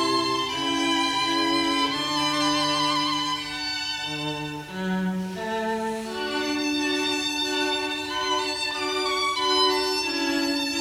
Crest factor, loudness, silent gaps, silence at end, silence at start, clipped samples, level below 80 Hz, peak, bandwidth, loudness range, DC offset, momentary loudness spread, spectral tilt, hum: 16 dB; -24 LUFS; none; 0 s; 0 s; under 0.1%; -56 dBFS; -8 dBFS; 18 kHz; 5 LU; under 0.1%; 7 LU; -3 dB/octave; none